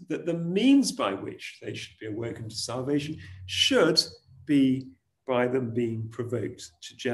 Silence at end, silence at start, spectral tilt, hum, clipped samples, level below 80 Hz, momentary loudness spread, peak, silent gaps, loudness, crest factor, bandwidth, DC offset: 0 s; 0 s; -4.5 dB/octave; none; under 0.1%; -66 dBFS; 16 LU; -8 dBFS; none; -27 LUFS; 18 dB; 12.5 kHz; under 0.1%